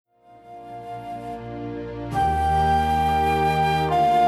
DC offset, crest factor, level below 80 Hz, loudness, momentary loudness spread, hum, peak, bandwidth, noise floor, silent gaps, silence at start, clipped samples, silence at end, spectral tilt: under 0.1%; 12 dB; -36 dBFS; -22 LUFS; 16 LU; none; -10 dBFS; 13.5 kHz; -47 dBFS; none; 0.35 s; under 0.1%; 0 s; -6 dB/octave